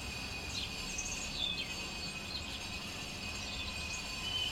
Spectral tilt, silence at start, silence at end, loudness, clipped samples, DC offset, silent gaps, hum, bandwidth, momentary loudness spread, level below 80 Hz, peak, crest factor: -2 dB/octave; 0 s; 0 s; -38 LUFS; under 0.1%; under 0.1%; none; none; 16.5 kHz; 5 LU; -52 dBFS; -24 dBFS; 16 dB